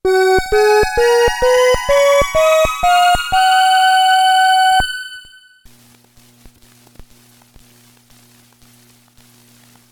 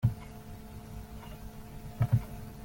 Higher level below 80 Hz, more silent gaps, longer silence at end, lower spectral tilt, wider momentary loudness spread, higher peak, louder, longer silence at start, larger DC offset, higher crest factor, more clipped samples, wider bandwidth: first, -34 dBFS vs -48 dBFS; neither; first, 4.7 s vs 0 s; second, -2.5 dB/octave vs -8 dB/octave; second, 3 LU vs 17 LU; first, -2 dBFS vs -14 dBFS; first, -12 LUFS vs -36 LUFS; about the same, 0.05 s vs 0 s; neither; second, 12 dB vs 20 dB; neither; first, 19 kHz vs 17 kHz